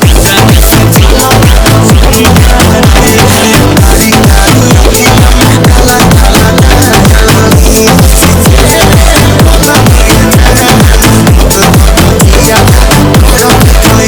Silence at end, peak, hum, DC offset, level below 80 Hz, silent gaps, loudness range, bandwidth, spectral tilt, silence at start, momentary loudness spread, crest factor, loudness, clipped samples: 0 s; 0 dBFS; none; under 0.1%; -8 dBFS; none; 0 LU; over 20 kHz; -4.5 dB/octave; 0 s; 1 LU; 2 dB; -3 LUFS; 40%